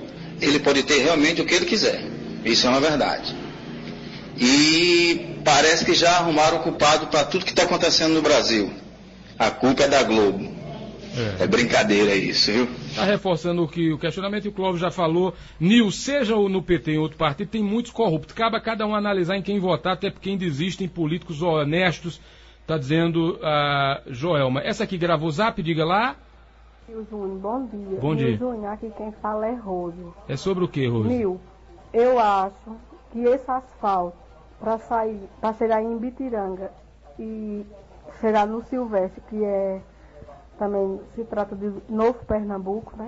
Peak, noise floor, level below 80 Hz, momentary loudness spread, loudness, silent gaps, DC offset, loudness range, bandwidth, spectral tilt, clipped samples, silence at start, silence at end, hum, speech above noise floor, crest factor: -4 dBFS; -50 dBFS; -48 dBFS; 15 LU; -22 LUFS; none; under 0.1%; 9 LU; 8 kHz; -4.5 dB/octave; under 0.1%; 0 s; 0 s; none; 28 dB; 18 dB